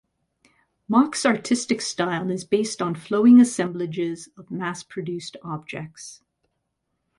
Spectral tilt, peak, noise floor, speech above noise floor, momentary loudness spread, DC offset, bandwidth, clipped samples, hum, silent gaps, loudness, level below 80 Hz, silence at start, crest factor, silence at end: -5 dB/octave; -6 dBFS; -77 dBFS; 55 dB; 20 LU; under 0.1%; 11.5 kHz; under 0.1%; none; none; -22 LUFS; -68 dBFS; 0.9 s; 18 dB; 1.05 s